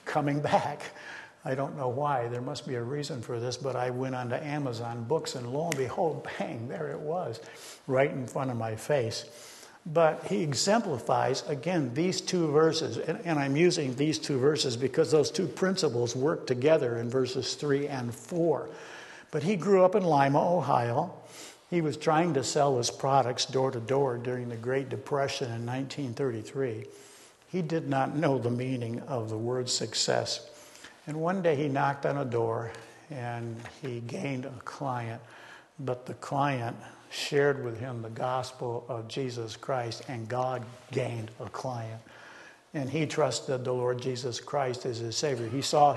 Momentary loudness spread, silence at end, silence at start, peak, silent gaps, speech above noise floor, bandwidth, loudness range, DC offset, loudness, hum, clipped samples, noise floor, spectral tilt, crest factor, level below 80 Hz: 14 LU; 0 s; 0.05 s; -10 dBFS; none; 22 dB; 12.5 kHz; 7 LU; under 0.1%; -30 LUFS; none; under 0.1%; -51 dBFS; -5 dB/octave; 20 dB; -72 dBFS